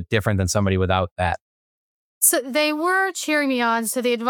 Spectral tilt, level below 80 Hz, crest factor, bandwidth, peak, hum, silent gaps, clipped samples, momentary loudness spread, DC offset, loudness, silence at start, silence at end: -4 dB/octave; -52 dBFS; 18 dB; 19.5 kHz; -4 dBFS; none; 1.11-1.16 s, 1.41-2.21 s; under 0.1%; 6 LU; under 0.1%; -20 LUFS; 0 s; 0 s